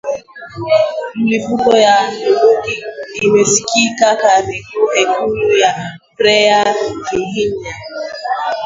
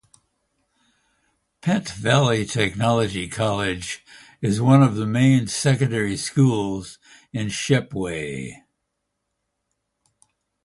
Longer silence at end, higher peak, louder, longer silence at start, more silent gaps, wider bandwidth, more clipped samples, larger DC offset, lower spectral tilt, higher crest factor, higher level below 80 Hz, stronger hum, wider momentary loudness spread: second, 0 s vs 2.1 s; about the same, 0 dBFS vs -2 dBFS; first, -13 LUFS vs -21 LUFS; second, 0.05 s vs 1.65 s; neither; second, 7.8 kHz vs 11.5 kHz; neither; neither; second, -3 dB/octave vs -5.5 dB/octave; second, 14 dB vs 20 dB; about the same, -50 dBFS vs -52 dBFS; neither; about the same, 14 LU vs 14 LU